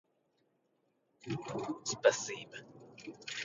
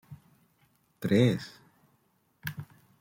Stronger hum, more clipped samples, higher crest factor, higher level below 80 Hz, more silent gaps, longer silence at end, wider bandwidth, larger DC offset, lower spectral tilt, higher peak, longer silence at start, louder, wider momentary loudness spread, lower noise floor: neither; neither; about the same, 26 dB vs 22 dB; second, -78 dBFS vs -68 dBFS; neither; second, 0 s vs 0.35 s; second, 8 kHz vs 16.5 kHz; neither; second, -3 dB/octave vs -7 dB/octave; about the same, -12 dBFS vs -12 dBFS; first, 1.25 s vs 0.1 s; second, -35 LUFS vs -29 LUFS; about the same, 21 LU vs 22 LU; first, -78 dBFS vs -71 dBFS